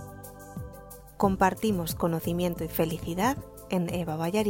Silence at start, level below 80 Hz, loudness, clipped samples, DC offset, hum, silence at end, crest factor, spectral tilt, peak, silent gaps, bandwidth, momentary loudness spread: 0 s; -48 dBFS; -28 LUFS; under 0.1%; under 0.1%; none; 0 s; 20 dB; -6 dB/octave; -10 dBFS; none; 17 kHz; 18 LU